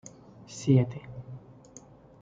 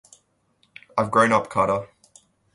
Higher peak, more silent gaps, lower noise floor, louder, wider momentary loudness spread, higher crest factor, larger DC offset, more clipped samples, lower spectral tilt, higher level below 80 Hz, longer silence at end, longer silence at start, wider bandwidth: second, -10 dBFS vs -4 dBFS; neither; second, -52 dBFS vs -66 dBFS; second, -27 LUFS vs -21 LUFS; first, 26 LU vs 11 LU; about the same, 20 dB vs 20 dB; neither; neither; first, -7.5 dB/octave vs -5.5 dB/octave; about the same, -62 dBFS vs -58 dBFS; first, 0.85 s vs 0.7 s; second, 0.5 s vs 0.95 s; second, 7.8 kHz vs 11.5 kHz